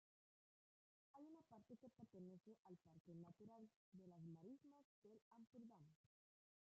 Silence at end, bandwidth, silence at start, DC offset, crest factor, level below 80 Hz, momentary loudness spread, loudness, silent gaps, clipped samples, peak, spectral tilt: 0.65 s; 7 kHz; 1.15 s; under 0.1%; 14 dB; under -90 dBFS; 6 LU; -66 LUFS; 2.40-2.44 s, 2.59-2.63 s, 3.00-3.05 s, 3.76-3.92 s, 4.84-5.02 s, 5.22-5.31 s, 5.95-6.04 s; under 0.1%; -52 dBFS; -9.5 dB/octave